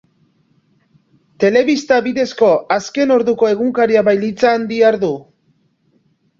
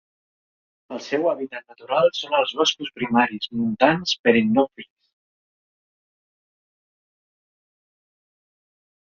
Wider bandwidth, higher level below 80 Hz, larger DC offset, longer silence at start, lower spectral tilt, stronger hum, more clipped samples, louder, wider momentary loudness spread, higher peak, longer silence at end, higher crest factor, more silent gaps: about the same, 7.6 kHz vs 7.2 kHz; first, -58 dBFS vs -64 dBFS; neither; first, 1.4 s vs 0.9 s; first, -5.5 dB/octave vs -2.5 dB/octave; neither; neither; first, -14 LUFS vs -21 LUFS; second, 6 LU vs 11 LU; about the same, -2 dBFS vs -2 dBFS; second, 1.2 s vs 4.2 s; second, 14 dB vs 24 dB; second, none vs 4.19-4.24 s